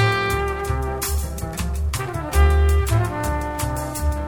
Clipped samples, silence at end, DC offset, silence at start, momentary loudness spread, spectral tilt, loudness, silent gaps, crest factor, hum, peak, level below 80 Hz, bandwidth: under 0.1%; 0 s; under 0.1%; 0 s; 8 LU; -5 dB/octave; -22 LUFS; none; 16 dB; none; -4 dBFS; -22 dBFS; 18.5 kHz